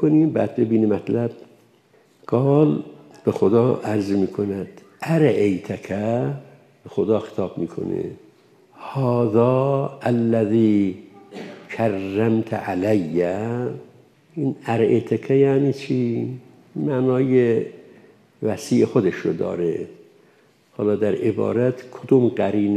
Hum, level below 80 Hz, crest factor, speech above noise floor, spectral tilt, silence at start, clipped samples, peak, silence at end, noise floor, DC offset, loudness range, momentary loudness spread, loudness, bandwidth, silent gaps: none; -68 dBFS; 18 dB; 37 dB; -8.5 dB/octave; 0 s; under 0.1%; -4 dBFS; 0 s; -56 dBFS; under 0.1%; 3 LU; 14 LU; -21 LUFS; 13 kHz; none